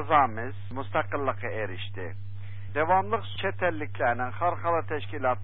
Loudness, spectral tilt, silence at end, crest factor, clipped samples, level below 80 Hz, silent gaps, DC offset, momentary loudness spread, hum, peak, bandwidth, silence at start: -29 LUFS; -10 dB/octave; 0 s; 22 dB; under 0.1%; -52 dBFS; none; 2%; 13 LU; none; -8 dBFS; 4.3 kHz; 0 s